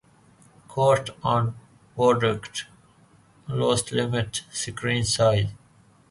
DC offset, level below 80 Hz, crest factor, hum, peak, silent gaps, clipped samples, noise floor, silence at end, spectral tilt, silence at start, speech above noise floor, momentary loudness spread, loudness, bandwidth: under 0.1%; -52 dBFS; 18 dB; none; -8 dBFS; none; under 0.1%; -57 dBFS; 0.55 s; -4.5 dB/octave; 0.7 s; 33 dB; 14 LU; -24 LUFS; 11.5 kHz